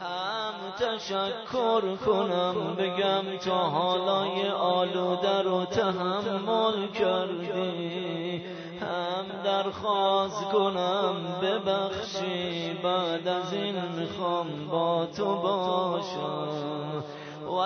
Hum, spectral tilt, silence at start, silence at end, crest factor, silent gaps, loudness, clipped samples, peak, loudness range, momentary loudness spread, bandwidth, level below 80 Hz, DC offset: none; -5.5 dB/octave; 0 s; 0 s; 16 dB; none; -28 LUFS; under 0.1%; -12 dBFS; 3 LU; 7 LU; 6.6 kHz; -68 dBFS; under 0.1%